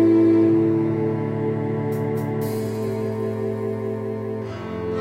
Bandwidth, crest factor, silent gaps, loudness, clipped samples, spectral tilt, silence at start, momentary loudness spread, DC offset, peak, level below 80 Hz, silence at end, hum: 15.5 kHz; 14 dB; none; -23 LUFS; under 0.1%; -9 dB/octave; 0 s; 12 LU; under 0.1%; -8 dBFS; -56 dBFS; 0 s; none